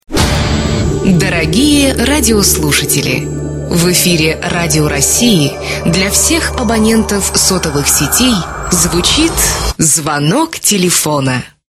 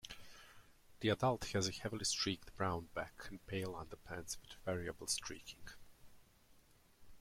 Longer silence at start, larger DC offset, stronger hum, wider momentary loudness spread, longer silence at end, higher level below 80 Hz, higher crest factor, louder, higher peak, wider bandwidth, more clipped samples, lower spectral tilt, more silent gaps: about the same, 0.1 s vs 0.05 s; neither; neither; second, 5 LU vs 19 LU; first, 0.2 s vs 0 s; first, -24 dBFS vs -64 dBFS; second, 12 dB vs 22 dB; first, -10 LUFS vs -41 LUFS; first, 0 dBFS vs -22 dBFS; about the same, 15.5 kHz vs 16.5 kHz; neither; about the same, -3.5 dB/octave vs -3.5 dB/octave; neither